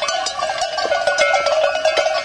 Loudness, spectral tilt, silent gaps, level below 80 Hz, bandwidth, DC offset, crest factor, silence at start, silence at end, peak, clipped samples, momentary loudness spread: -17 LUFS; 0 dB/octave; none; -54 dBFS; 10.5 kHz; under 0.1%; 16 dB; 0 s; 0 s; -2 dBFS; under 0.1%; 5 LU